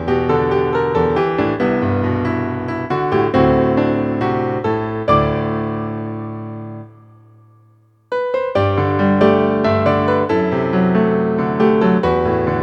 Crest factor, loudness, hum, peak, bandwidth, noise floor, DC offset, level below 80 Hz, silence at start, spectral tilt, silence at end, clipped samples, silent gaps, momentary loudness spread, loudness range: 16 dB; -17 LUFS; none; 0 dBFS; 7 kHz; -52 dBFS; under 0.1%; -40 dBFS; 0 s; -9 dB/octave; 0 s; under 0.1%; none; 10 LU; 7 LU